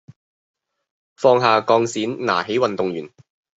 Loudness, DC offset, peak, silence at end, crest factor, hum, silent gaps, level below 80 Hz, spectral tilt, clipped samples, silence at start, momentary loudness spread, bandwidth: -19 LUFS; under 0.1%; -2 dBFS; 0.5 s; 20 dB; none; none; -68 dBFS; -5 dB/octave; under 0.1%; 1.2 s; 9 LU; 8 kHz